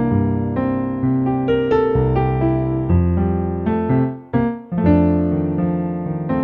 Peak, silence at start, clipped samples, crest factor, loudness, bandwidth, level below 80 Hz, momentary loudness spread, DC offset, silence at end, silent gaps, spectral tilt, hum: -2 dBFS; 0 s; under 0.1%; 16 dB; -19 LUFS; 4.3 kHz; -34 dBFS; 5 LU; under 0.1%; 0 s; none; -11.5 dB/octave; none